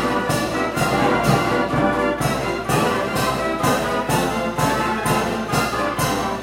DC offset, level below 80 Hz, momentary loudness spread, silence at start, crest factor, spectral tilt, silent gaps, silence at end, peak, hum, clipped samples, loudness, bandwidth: under 0.1%; -40 dBFS; 3 LU; 0 s; 16 dB; -5 dB/octave; none; 0 s; -4 dBFS; none; under 0.1%; -20 LUFS; 16 kHz